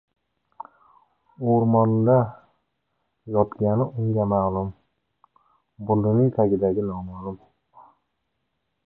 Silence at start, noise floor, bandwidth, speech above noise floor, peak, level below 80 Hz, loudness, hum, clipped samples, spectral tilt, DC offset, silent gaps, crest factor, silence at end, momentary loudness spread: 1.4 s; -77 dBFS; 2.3 kHz; 56 dB; -6 dBFS; -52 dBFS; -22 LUFS; none; under 0.1%; -14.5 dB/octave; under 0.1%; none; 18 dB; 1.55 s; 18 LU